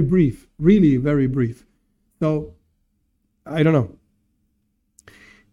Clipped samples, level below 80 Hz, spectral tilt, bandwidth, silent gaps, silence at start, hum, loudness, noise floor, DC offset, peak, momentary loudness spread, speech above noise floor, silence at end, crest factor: under 0.1%; -44 dBFS; -9.5 dB/octave; 11 kHz; none; 0 s; none; -19 LUFS; -69 dBFS; under 0.1%; -4 dBFS; 12 LU; 51 dB; 1.65 s; 18 dB